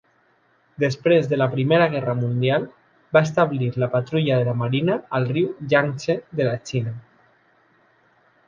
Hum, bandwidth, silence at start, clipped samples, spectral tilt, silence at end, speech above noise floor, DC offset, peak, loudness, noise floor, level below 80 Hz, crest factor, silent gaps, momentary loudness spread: none; 7.4 kHz; 0.8 s; under 0.1%; -7 dB/octave; 1.5 s; 41 dB; under 0.1%; -2 dBFS; -21 LUFS; -62 dBFS; -60 dBFS; 20 dB; none; 7 LU